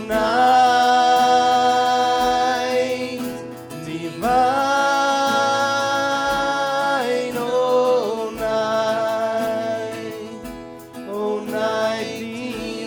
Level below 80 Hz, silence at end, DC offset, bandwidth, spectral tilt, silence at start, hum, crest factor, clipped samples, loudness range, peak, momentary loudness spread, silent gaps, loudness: -52 dBFS; 0 s; under 0.1%; over 20 kHz; -3.5 dB/octave; 0 s; none; 16 dB; under 0.1%; 7 LU; -4 dBFS; 15 LU; none; -19 LUFS